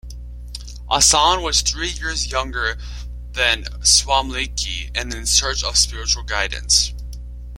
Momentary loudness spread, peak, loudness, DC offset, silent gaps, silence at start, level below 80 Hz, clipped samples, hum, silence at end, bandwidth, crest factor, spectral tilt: 20 LU; 0 dBFS; -17 LUFS; under 0.1%; none; 0.05 s; -30 dBFS; under 0.1%; 60 Hz at -30 dBFS; 0 s; 16.5 kHz; 20 dB; -0.5 dB/octave